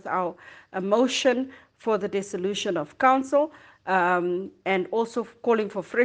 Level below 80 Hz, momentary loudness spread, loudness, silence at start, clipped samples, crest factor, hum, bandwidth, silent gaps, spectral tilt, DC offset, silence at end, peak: -72 dBFS; 10 LU; -25 LUFS; 0.05 s; under 0.1%; 20 dB; none; 10 kHz; none; -4.5 dB/octave; under 0.1%; 0 s; -6 dBFS